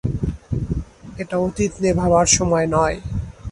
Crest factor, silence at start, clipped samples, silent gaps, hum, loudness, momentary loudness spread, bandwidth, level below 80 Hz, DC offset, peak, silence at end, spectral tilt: 18 dB; 0.05 s; under 0.1%; none; none; -20 LUFS; 14 LU; 11.5 kHz; -32 dBFS; under 0.1%; -2 dBFS; 0 s; -4.5 dB/octave